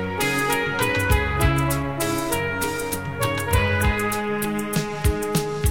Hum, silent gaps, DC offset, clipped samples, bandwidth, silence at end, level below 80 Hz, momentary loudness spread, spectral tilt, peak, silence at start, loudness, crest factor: none; none; 0.7%; under 0.1%; 17.5 kHz; 0 s; -32 dBFS; 5 LU; -4.5 dB/octave; -6 dBFS; 0 s; -22 LUFS; 16 dB